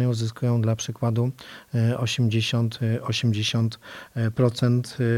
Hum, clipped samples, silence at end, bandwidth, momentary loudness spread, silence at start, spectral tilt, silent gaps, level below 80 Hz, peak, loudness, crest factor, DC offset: none; under 0.1%; 0 s; 12.5 kHz; 6 LU; 0 s; -6 dB/octave; none; -60 dBFS; -6 dBFS; -24 LUFS; 16 dB; under 0.1%